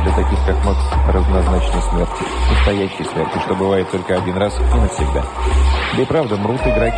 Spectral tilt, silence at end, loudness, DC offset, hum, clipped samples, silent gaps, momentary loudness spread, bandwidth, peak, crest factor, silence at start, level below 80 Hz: -6.5 dB/octave; 0 s; -17 LUFS; under 0.1%; none; under 0.1%; none; 4 LU; 10 kHz; -2 dBFS; 12 dB; 0 s; -18 dBFS